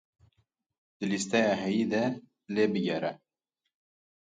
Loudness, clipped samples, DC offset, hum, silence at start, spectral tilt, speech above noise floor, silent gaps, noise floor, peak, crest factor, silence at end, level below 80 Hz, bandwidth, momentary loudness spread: -29 LUFS; under 0.1%; under 0.1%; none; 1 s; -5 dB/octave; 57 dB; none; -85 dBFS; -12 dBFS; 20 dB; 1.2 s; -72 dBFS; 9.4 kHz; 10 LU